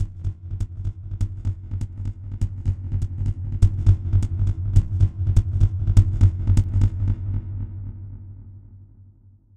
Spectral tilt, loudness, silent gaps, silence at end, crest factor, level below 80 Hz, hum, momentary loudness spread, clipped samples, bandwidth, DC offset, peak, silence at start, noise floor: -8.5 dB/octave; -24 LUFS; none; 0.55 s; 20 dB; -26 dBFS; none; 14 LU; under 0.1%; 8.2 kHz; under 0.1%; -2 dBFS; 0 s; -51 dBFS